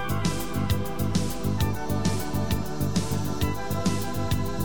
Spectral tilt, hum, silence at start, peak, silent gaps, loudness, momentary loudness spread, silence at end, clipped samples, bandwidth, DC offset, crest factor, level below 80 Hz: -5.5 dB/octave; none; 0 s; -12 dBFS; none; -28 LUFS; 2 LU; 0 s; under 0.1%; over 20 kHz; 3%; 14 dB; -38 dBFS